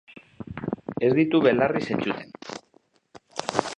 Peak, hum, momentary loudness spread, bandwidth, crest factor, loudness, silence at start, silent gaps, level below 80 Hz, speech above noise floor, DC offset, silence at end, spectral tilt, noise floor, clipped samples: -2 dBFS; none; 20 LU; 10.5 kHz; 24 dB; -24 LUFS; 0.4 s; none; -58 dBFS; 40 dB; under 0.1%; 0.05 s; -6 dB/octave; -63 dBFS; under 0.1%